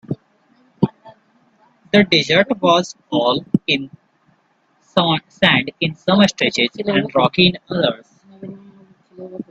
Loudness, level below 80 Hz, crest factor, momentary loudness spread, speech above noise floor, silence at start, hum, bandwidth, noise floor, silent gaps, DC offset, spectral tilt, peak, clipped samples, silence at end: -16 LUFS; -54 dBFS; 18 dB; 20 LU; 44 dB; 0.1 s; none; 8 kHz; -61 dBFS; none; under 0.1%; -5 dB/octave; 0 dBFS; under 0.1%; 0.1 s